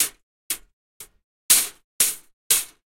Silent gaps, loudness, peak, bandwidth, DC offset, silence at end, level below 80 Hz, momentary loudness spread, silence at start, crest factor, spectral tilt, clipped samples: 0.23-0.50 s, 0.73-1.00 s, 1.24-1.49 s, 1.84-1.99 s, 2.33-2.50 s; -21 LUFS; 0 dBFS; 16.5 kHz; under 0.1%; 0.3 s; -60 dBFS; 13 LU; 0 s; 26 dB; 2.5 dB/octave; under 0.1%